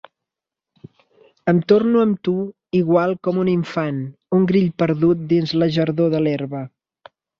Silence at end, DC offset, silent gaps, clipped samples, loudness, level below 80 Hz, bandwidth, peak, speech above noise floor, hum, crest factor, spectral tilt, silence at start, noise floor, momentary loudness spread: 0.7 s; under 0.1%; none; under 0.1%; -19 LUFS; -58 dBFS; 6.8 kHz; -2 dBFS; 68 dB; none; 18 dB; -8.5 dB/octave; 1.45 s; -86 dBFS; 10 LU